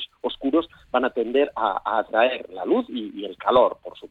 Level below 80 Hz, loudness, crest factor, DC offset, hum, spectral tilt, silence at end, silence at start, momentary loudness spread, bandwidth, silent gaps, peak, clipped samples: -58 dBFS; -23 LUFS; 18 dB; under 0.1%; none; -6.5 dB/octave; 0.05 s; 0 s; 11 LU; 4.6 kHz; none; -6 dBFS; under 0.1%